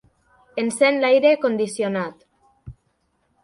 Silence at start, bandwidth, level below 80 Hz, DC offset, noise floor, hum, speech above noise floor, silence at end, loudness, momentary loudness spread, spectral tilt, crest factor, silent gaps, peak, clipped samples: 0.55 s; 11.5 kHz; -56 dBFS; under 0.1%; -68 dBFS; none; 49 dB; 0.7 s; -19 LUFS; 13 LU; -4.5 dB/octave; 18 dB; none; -4 dBFS; under 0.1%